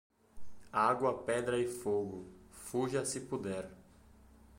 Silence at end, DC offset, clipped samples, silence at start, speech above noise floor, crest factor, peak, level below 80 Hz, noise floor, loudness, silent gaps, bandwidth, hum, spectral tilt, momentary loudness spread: 0 s; under 0.1%; under 0.1%; 0.35 s; 26 dB; 20 dB; -16 dBFS; -64 dBFS; -61 dBFS; -35 LUFS; none; 16.5 kHz; none; -4.5 dB/octave; 17 LU